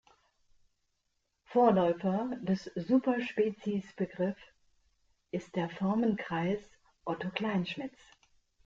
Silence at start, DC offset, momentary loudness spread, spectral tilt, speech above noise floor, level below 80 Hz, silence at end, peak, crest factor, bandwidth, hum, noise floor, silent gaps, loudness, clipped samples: 1.5 s; under 0.1%; 12 LU; -7.5 dB/octave; 49 dB; -70 dBFS; 0.75 s; -14 dBFS; 20 dB; 7.4 kHz; none; -80 dBFS; none; -32 LUFS; under 0.1%